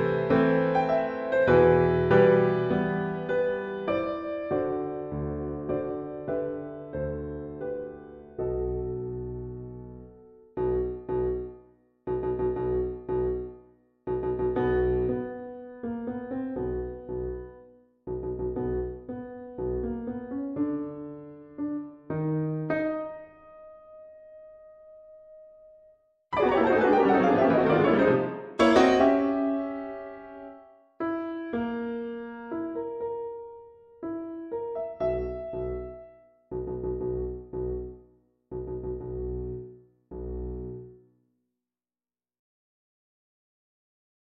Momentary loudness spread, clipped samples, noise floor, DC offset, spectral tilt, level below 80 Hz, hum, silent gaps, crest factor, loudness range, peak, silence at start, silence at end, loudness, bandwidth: 20 LU; under 0.1%; under -90 dBFS; under 0.1%; -8 dB/octave; -46 dBFS; none; none; 22 dB; 13 LU; -6 dBFS; 0 s; 3.45 s; -28 LUFS; 7.8 kHz